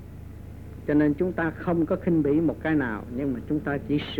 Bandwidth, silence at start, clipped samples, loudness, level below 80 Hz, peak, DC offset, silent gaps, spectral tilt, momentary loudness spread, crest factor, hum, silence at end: 4.7 kHz; 0 s; under 0.1%; -26 LUFS; -46 dBFS; -12 dBFS; under 0.1%; none; -9 dB/octave; 19 LU; 14 dB; none; 0 s